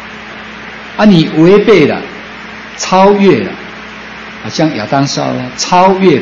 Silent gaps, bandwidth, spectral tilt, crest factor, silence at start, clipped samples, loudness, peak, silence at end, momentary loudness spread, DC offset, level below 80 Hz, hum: none; 7.6 kHz; -5.5 dB/octave; 10 dB; 0 s; 0.8%; -9 LUFS; 0 dBFS; 0 s; 19 LU; under 0.1%; -44 dBFS; none